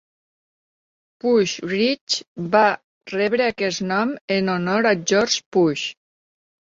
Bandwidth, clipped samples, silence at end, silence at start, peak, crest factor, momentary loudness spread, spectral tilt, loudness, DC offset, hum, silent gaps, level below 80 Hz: 8 kHz; under 0.1%; 0.75 s; 1.25 s; -2 dBFS; 20 dB; 7 LU; -4 dB/octave; -20 LUFS; under 0.1%; none; 2.01-2.07 s, 2.28-2.36 s, 2.84-3.01 s, 4.21-4.28 s, 5.46-5.52 s; -62 dBFS